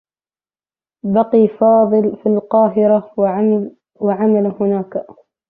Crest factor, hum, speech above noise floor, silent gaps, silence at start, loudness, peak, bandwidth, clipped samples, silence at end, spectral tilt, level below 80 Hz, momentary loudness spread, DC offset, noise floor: 14 dB; none; over 76 dB; none; 1.05 s; -15 LUFS; -2 dBFS; 3.6 kHz; under 0.1%; 0.35 s; -13 dB/octave; -60 dBFS; 9 LU; under 0.1%; under -90 dBFS